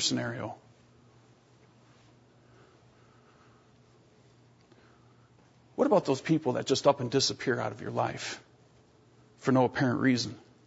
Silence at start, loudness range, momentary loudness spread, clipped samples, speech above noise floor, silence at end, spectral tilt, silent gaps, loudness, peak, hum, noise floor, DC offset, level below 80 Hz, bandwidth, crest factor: 0 s; 10 LU; 13 LU; under 0.1%; 33 dB; 0.3 s; -4.5 dB/octave; none; -29 LUFS; -10 dBFS; none; -61 dBFS; under 0.1%; -70 dBFS; 8 kHz; 22 dB